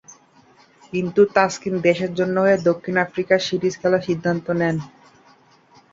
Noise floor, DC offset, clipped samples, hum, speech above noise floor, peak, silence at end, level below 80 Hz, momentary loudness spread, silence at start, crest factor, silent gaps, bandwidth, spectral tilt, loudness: -54 dBFS; under 0.1%; under 0.1%; none; 34 dB; -2 dBFS; 1.05 s; -60 dBFS; 6 LU; 0.1 s; 20 dB; none; 7.8 kHz; -6 dB/octave; -20 LUFS